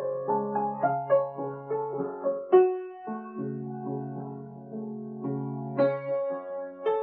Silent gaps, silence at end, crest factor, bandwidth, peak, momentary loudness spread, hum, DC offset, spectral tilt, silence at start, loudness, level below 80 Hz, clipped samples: none; 0 s; 20 dB; 4.3 kHz; -8 dBFS; 14 LU; none; under 0.1%; -8 dB/octave; 0 s; -29 LUFS; -86 dBFS; under 0.1%